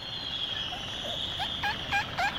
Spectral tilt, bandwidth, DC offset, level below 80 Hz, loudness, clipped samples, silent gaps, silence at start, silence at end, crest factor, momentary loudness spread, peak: -2.5 dB/octave; 17 kHz; under 0.1%; -52 dBFS; -31 LUFS; under 0.1%; none; 0 s; 0 s; 16 dB; 5 LU; -16 dBFS